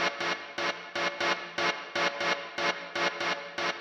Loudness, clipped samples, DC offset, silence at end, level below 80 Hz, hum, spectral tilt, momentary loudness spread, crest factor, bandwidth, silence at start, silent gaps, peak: -30 LUFS; under 0.1%; under 0.1%; 0 s; -78 dBFS; none; -2 dB/octave; 4 LU; 18 dB; 16.5 kHz; 0 s; none; -14 dBFS